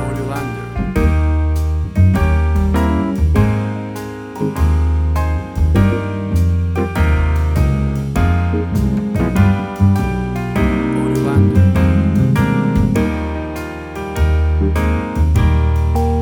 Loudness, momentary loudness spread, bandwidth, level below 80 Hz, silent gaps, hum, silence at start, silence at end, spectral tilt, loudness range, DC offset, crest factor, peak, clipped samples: -16 LUFS; 8 LU; 16 kHz; -20 dBFS; none; none; 0 s; 0 s; -8 dB/octave; 2 LU; under 0.1%; 14 dB; 0 dBFS; under 0.1%